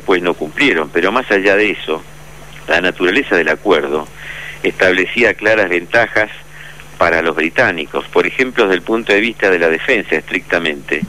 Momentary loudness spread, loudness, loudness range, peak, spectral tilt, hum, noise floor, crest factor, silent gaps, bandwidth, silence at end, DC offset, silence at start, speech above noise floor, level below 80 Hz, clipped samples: 9 LU; -14 LUFS; 2 LU; -2 dBFS; -4.5 dB/octave; none; -36 dBFS; 14 dB; none; 15.5 kHz; 0 s; 1%; 0 s; 21 dB; -44 dBFS; under 0.1%